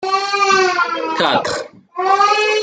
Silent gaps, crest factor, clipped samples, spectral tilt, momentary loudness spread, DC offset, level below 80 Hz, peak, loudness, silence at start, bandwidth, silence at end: none; 14 dB; under 0.1%; -2 dB/octave; 10 LU; under 0.1%; -64 dBFS; -2 dBFS; -15 LUFS; 0 s; 9.4 kHz; 0 s